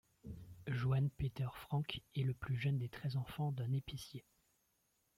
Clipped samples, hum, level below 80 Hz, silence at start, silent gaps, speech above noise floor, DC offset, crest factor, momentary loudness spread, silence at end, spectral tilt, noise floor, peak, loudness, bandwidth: under 0.1%; none; -62 dBFS; 0.25 s; none; 41 dB; under 0.1%; 16 dB; 15 LU; 0.95 s; -7 dB/octave; -80 dBFS; -24 dBFS; -41 LUFS; 15.5 kHz